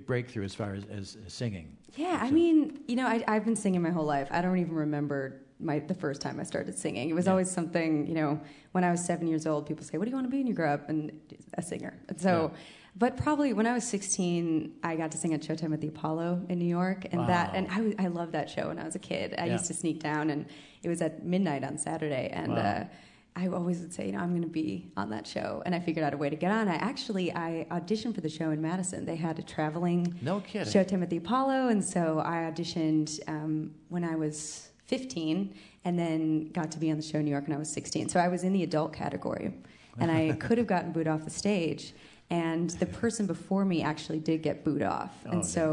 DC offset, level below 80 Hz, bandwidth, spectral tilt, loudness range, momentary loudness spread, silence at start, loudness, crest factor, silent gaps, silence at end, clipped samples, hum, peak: under 0.1%; -66 dBFS; 11 kHz; -5.5 dB/octave; 4 LU; 9 LU; 0 s; -31 LUFS; 18 dB; none; 0 s; under 0.1%; none; -12 dBFS